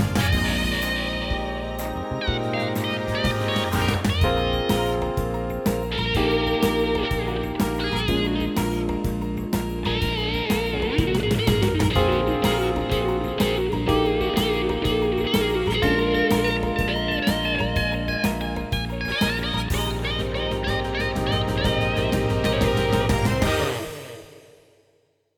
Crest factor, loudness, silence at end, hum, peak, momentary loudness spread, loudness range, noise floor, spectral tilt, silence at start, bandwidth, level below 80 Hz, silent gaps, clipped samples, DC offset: 18 dB; -23 LUFS; 1 s; none; -6 dBFS; 6 LU; 3 LU; -65 dBFS; -5.5 dB/octave; 0 s; 19.5 kHz; -32 dBFS; none; under 0.1%; under 0.1%